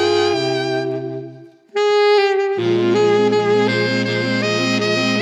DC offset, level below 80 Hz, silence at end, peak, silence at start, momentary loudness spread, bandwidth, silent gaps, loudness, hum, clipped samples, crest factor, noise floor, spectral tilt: under 0.1%; -74 dBFS; 0 s; -4 dBFS; 0 s; 10 LU; 10.5 kHz; none; -17 LUFS; none; under 0.1%; 12 dB; -39 dBFS; -5 dB/octave